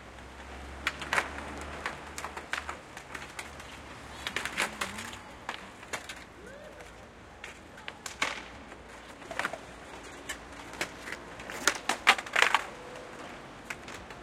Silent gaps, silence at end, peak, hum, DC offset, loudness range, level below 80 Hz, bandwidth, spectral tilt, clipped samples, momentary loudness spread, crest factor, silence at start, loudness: none; 0 s; -6 dBFS; none; under 0.1%; 10 LU; -56 dBFS; 16.5 kHz; -1.5 dB/octave; under 0.1%; 20 LU; 32 dB; 0 s; -34 LUFS